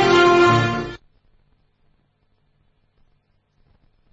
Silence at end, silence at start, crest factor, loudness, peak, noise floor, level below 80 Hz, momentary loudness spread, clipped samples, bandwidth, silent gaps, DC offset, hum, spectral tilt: 3.15 s; 0 s; 18 dB; -15 LUFS; -4 dBFS; -64 dBFS; -48 dBFS; 21 LU; under 0.1%; 7.8 kHz; none; under 0.1%; 50 Hz at -60 dBFS; -5.5 dB/octave